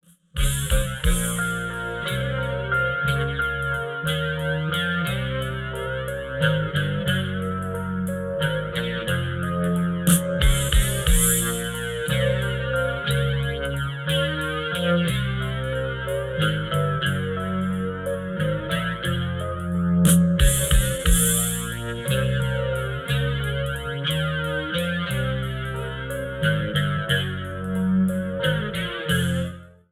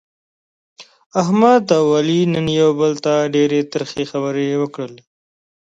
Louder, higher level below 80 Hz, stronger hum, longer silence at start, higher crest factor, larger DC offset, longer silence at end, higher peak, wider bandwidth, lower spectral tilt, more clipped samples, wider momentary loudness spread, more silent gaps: second, -24 LUFS vs -16 LUFS; first, -30 dBFS vs -58 dBFS; neither; second, 0.35 s vs 0.8 s; about the same, 20 dB vs 16 dB; neither; second, 0.2 s vs 0.7 s; second, -4 dBFS vs 0 dBFS; first, 17 kHz vs 7.8 kHz; second, -4.5 dB/octave vs -6 dB/octave; neither; about the same, 8 LU vs 10 LU; second, none vs 1.06-1.10 s